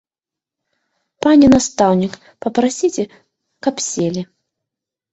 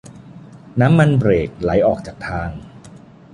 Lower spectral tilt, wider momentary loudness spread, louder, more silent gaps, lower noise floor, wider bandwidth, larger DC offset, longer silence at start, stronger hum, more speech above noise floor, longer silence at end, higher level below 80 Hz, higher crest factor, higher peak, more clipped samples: second, -5 dB/octave vs -8.5 dB/octave; about the same, 16 LU vs 14 LU; about the same, -16 LUFS vs -17 LUFS; neither; first, -88 dBFS vs -41 dBFS; second, 8.2 kHz vs 11 kHz; neither; first, 1.25 s vs 0.1 s; neither; first, 73 dB vs 25 dB; first, 0.9 s vs 0.45 s; second, -46 dBFS vs -38 dBFS; about the same, 18 dB vs 16 dB; about the same, 0 dBFS vs -2 dBFS; neither